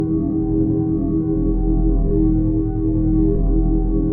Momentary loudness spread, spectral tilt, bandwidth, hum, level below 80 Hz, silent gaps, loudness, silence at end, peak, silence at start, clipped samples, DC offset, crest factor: 2 LU; -15 dB/octave; 1.6 kHz; none; -20 dBFS; none; -19 LUFS; 0 s; -6 dBFS; 0 s; under 0.1%; under 0.1%; 12 dB